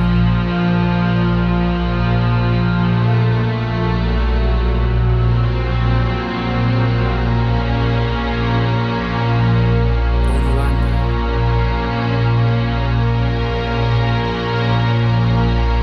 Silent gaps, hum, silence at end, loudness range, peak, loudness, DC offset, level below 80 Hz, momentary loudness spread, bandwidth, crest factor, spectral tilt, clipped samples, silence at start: none; none; 0 s; 1 LU; -4 dBFS; -17 LUFS; under 0.1%; -20 dBFS; 3 LU; 6 kHz; 10 dB; -8.5 dB/octave; under 0.1%; 0 s